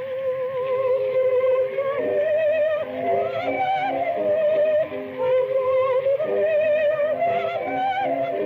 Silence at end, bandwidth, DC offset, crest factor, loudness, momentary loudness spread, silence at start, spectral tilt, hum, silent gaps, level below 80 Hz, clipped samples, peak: 0 s; 4.8 kHz; under 0.1%; 8 dB; -22 LUFS; 5 LU; 0 s; -7 dB/octave; none; none; -72 dBFS; under 0.1%; -12 dBFS